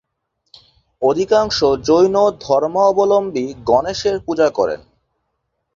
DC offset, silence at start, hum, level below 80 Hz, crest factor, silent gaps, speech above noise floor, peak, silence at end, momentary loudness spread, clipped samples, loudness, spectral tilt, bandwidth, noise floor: under 0.1%; 1 s; none; -48 dBFS; 16 dB; none; 57 dB; -2 dBFS; 1 s; 7 LU; under 0.1%; -16 LUFS; -5 dB/octave; 7.4 kHz; -72 dBFS